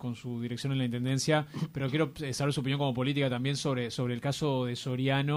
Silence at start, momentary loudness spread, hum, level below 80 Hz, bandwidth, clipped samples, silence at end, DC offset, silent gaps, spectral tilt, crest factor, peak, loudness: 0 s; 5 LU; none; -62 dBFS; 16 kHz; under 0.1%; 0 s; under 0.1%; none; -5.5 dB/octave; 16 dB; -14 dBFS; -31 LUFS